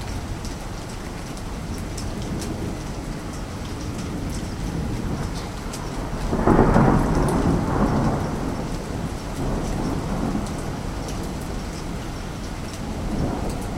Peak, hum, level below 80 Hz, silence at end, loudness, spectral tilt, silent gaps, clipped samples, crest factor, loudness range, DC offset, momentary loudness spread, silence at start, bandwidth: 0 dBFS; none; -32 dBFS; 0 s; -26 LUFS; -6.5 dB/octave; none; under 0.1%; 24 dB; 9 LU; under 0.1%; 12 LU; 0 s; 16 kHz